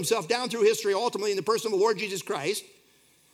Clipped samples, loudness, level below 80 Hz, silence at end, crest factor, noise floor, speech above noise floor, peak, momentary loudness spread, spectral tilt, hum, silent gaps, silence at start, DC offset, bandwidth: under 0.1%; -27 LUFS; -82 dBFS; 0.7 s; 18 dB; -62 dBFS; 35 dB; -10 dBFS; 6 LU; -3 dB/octave; none; none; 0 s; under 0.1%; 16 kHz